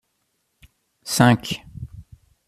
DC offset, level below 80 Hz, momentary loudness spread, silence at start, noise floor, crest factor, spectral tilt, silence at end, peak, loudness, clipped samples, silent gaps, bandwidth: under 0.1%; -50 dBFS; 22 LU; 1.05 s; -72 dBFS; 24 dB; -5 dB/octave; 0.45 s; 0 dBFS; -20 LUFS; under 0.1%; none; 15 kHz